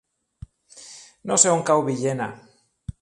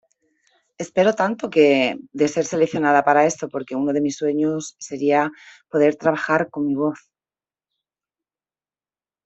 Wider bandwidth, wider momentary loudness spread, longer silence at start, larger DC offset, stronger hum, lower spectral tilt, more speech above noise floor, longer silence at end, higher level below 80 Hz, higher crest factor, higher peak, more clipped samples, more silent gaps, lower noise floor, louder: first, 11.5 kHz vs 8.2 kHz; first, 24 LU vs 11 LU; about the same, 0.75 s vs 0.8 s; neither; neither; second, -3.5 dB/octave vs -5 dB/octave; second, 26 dB vs over 70 dB; second, 0.1 s vs 2.3 s; first, -52 dBFS vs -66 dBFS; about the same, 24 dB vs 20 dB; about the same, 0 dBFS vs -2 dBFS; neither; neither; second, -47 dBFS vs under -90 dBFS; about the same, -20 LUFS vs -20 LUFS